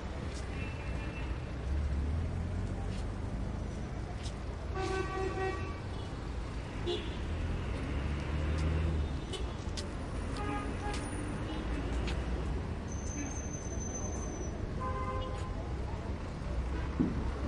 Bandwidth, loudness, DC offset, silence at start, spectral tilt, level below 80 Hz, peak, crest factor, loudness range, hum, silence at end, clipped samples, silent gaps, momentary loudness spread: 11 kHz; -38 LUFS; under 0.1%; 0 s; -5.5 dB/octave; -40 dBFS; -18 dBFS; 18 dB; 2 LU; none; 0 s; under 0.1%; none; 6 LU